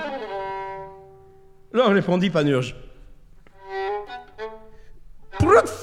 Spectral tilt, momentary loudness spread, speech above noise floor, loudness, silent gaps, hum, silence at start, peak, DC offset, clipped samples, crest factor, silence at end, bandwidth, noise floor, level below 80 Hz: -6.5 dB/octave; 21 LU; 29 dB; -22 LUFS; none; none; 0 s; -2 dBFS; under 0.1%; under 0.1%; 22 dB; 0 s; 13.5 kHz; -48 dBFS; -46 dBFS